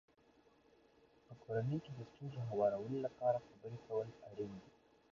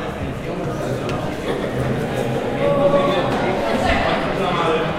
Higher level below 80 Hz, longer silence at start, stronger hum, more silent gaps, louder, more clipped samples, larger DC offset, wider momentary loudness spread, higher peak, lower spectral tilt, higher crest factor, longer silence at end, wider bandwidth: second, -76 dBFS vs -36 dBFS; first, 1.3 s vs 0 s; neither; neither; second, -42 LUFS vs -20 LUFS; neither; neither; first, 15 LU vs 8 LU; second, -24 dBFS vs -2 dBFS; first, -8 dB/octave vs -6 dB/octave; about the same, 20 dB vs 18 dB; first, 0.45 s vs 0 s; second, 7.2 kHz vs 16 kHz